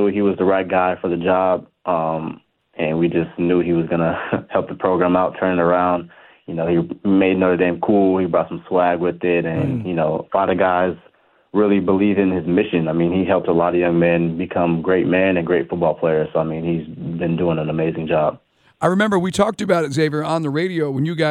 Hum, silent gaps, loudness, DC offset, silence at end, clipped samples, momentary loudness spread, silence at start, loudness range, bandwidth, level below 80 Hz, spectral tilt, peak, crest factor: none; none; -19 LUFS; under 0.1%; 0 s; under 0.1%; 6 LU; 0 s; 3 LU; 11.5 kHz; -52 dBFS; -7.5 dB/octave; -2 dBFS; 16 dB